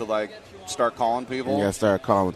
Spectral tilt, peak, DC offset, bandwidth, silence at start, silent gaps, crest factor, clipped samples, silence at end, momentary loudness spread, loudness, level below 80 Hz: -5 dB/octave; -6 dBFS; under 0.1%; 13.5 kHz; 0 s; none; 18 dB; under 0.1%; 0 s; 13 LU; -25 LUFS; -56 dBFS